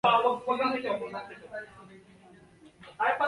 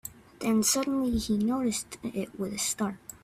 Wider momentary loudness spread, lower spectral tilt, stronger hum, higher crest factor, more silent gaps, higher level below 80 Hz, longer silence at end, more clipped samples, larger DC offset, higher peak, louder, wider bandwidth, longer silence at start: first, 22 LU vs 10 LU; first, -5 dB/octave vs -3.5 dB/octave; neither; about the same, 20 dB vs 16 dB; neither; second, -70 dBFS vs -50 dBFS; about the same, 0 s vs 0.1 s; neither; neither; first, -10 dBFS vs -14 dBFS; about the same, -30 LUFS vs -29 LUFS; second, 11.5 kHz vs 16 kHz; about the same, 0.05 s vs 0.05 s